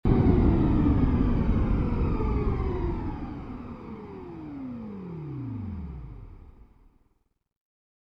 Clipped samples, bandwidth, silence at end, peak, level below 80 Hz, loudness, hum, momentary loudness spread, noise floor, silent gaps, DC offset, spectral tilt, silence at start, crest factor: under 0.1%; 5.4 kHz; 1.55 s; -8 dBFS; -32 dBFS; -27 LUFS; none; 18 LU; -70 dBFS; none; under 0.1%; -11 dB/octave; 0.05 s; 18 dB